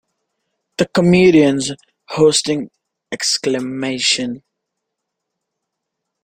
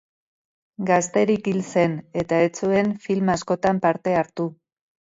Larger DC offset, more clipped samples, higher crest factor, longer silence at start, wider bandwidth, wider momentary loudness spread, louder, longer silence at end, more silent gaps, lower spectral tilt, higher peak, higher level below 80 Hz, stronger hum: neither; neither; about the same, 18 dB vs 18 dB; about the same, 0.8 s vs 0.8 s; first, 16 kHz vs 7.8 kHz; first, 20 LU vs 7 LU; first, -15 LUFS vs -22 LUFS; first, 1.85 s vs 0.6 s; neither; second, -4 dB/octave vs -6 dB/octave; first, 0 dBFS vs -6 dBFS; about the same, -54 dBFS vs -58 dBFS; neither